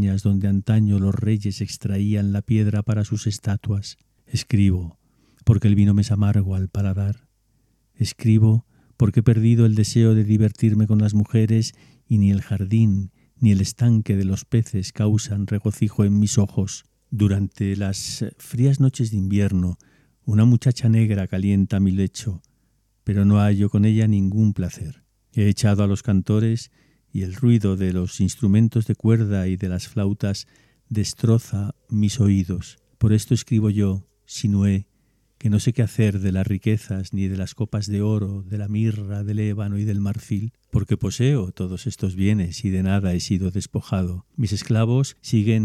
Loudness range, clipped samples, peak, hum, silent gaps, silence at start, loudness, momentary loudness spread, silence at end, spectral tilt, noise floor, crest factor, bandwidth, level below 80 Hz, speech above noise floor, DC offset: 5 LU; under 0.1%; -2 dBFS; none; none; 0 s; -21 LUFS; 10 LU; 0 s; -7 dB/octave; -65 dBFS; 18 dB; 12.5 kHz; -48 dBFS; 45 dB; under 0.1%